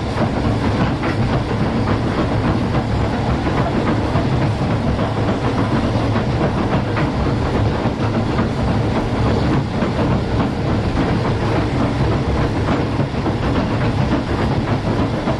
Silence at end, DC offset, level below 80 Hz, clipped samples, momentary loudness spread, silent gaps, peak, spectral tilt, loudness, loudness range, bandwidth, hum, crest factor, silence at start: 0 s; under 0.1%; -28 dBFS; under 0.1%; 1 LU; none; -4 dBFS; -7.5 dB/octave; -18 LUFS; 0 LU; 11 kHz; none; 14 dB; 0 s